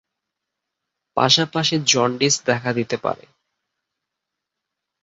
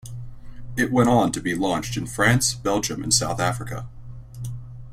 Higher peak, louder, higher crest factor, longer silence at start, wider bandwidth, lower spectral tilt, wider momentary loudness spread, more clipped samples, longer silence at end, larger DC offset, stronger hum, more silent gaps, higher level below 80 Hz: about the same, -2 dBFS vs -4 dBFS; first, -19 LUFS vs -22 LUFS; about the same, 22 dB vs 20 dB; first, 1.15 s vs 0.05 s; second, 8 kHz vs 16 kHz; about the same, -3 dB/octave vs -4 dB/octave; second, 11 LU vs 20 LU; neither; first, 1.9 s vs 0 s; neither; neither; neither; second, -62 dBFS vs -44 dBFS